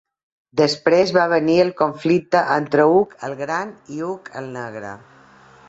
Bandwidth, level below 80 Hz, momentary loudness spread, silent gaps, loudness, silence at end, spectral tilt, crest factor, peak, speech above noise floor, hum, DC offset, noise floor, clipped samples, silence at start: 8 kHz; -60 dBFS; 15 LU; none; -18 LUFS; 0.7 s; -5.5 dB/octave; 18 dB; -2 dBFS; 29 dB; none; under 0.1%; -48 dBFS; under 0.1%; 0.55 s